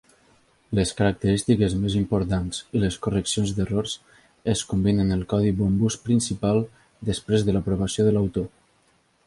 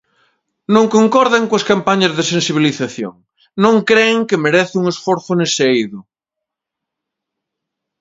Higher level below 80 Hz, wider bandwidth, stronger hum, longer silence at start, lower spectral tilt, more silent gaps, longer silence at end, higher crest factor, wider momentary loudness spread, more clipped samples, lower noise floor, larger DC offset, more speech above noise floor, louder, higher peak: first, -42 dBFS vs -60 dBFS; first, 11.5 kHz vs 7.8 kHz; neither; about the same, 0.7 s vs 0.7 s; first, -6 dB/octave vs -4.5 dB/octave; neither; second, 0.8 s vs 2 s; about the same, 16 dB vs 16 dB; second, 8 LU vs 11 LU; neither; second, -63 dBFS vs -82 dBFS; neither; second, 41 dB vs 68 dB; second, -24 LUFS vs -14 LUFS; second, -8 dBFS vs 0 dBFS